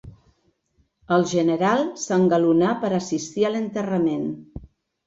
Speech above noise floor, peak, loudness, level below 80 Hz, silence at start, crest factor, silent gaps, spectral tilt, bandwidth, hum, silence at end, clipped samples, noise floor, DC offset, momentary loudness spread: 46 dB; -6 dBFS; -22 LUFS; -54 dBFS; 0.05 s; 16 dB; none; -6 dB/octave; 7.8 kHz; none; 0.4 s; under 0.1%; -67 dBFS; under 0.1%; 11 LU